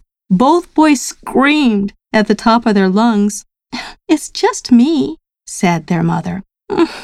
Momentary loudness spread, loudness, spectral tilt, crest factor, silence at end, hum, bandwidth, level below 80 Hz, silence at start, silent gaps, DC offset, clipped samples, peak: 15 LU; -13 LUFS; -5.5 dB/octave; 14 dB; 0 s; none; 13.5 kHz; -46 dBFS; 0.3 s; none; under 0.1%; under 0.1%; 0 dBFS